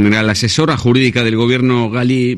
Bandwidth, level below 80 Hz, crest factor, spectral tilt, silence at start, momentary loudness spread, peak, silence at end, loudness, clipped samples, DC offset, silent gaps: 12.5 kHz; -44 dBFS; 12 dB; -5.5 dB/octave; 0 s; 2 LU; 0 dBFS; 0 s; -13 LUFS; under 0.1%; under 0.1%; none